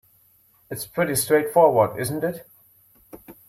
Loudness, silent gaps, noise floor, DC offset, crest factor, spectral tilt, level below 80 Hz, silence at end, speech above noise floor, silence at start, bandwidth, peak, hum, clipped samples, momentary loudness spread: -21 LUFS; none; -59 dBFS; under 0.1%; 18 dB; -4.5 dB/octave; -60 dBFS; 0.15 s; 38 dB; 0.7 s; 16 kHz; -4 dBFS; none; under 0.1%; 17 LU